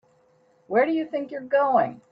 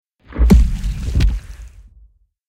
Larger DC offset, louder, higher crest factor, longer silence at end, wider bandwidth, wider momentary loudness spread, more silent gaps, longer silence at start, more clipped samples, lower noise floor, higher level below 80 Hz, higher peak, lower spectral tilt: neither; second, -24 LUFS vs -17 LUFS; about the same, 16 dB vs 16 dB; second, 0.15 s vs 0.8 s; second, 5.4 kHz vs 12.5 kHz; second, 9 LU vs 19 LU; neither; first, 0.7 s vs 0.3 s; neither; first, -61 dBFS vs -51 dBFS; second, -74 dBFS vs -18 dBFS; second, -10 dBFS vs 0 dBFS; about the same, -8 dB/octave vs -7.5 dB/octave